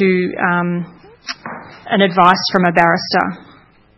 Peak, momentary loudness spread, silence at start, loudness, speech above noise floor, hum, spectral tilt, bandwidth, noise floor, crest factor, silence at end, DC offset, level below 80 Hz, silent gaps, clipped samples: 0 dBFS; 21 LU; 0 s; -14 LUFS; 32 dB; none; -6 dB/octave; 6.6 kHz; -47 dBFS; 16 dB; 0.55 s; under 0.1%; -56 dBFS; none; 0.1%